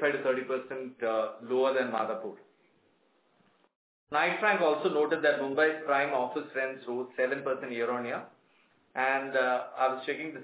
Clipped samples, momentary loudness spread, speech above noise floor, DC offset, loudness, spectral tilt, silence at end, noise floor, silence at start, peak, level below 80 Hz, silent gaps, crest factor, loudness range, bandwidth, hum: under 0.1%; 9 LU; 39 dB; under 0.1%; -30 LUFS; -2 dB/octave; 0 s; -69 dBFS; 0 s; -12 dBFS; -84 dBFS; 3.76-4.07 s; 18 dB; 5 LU; 4 kHz; none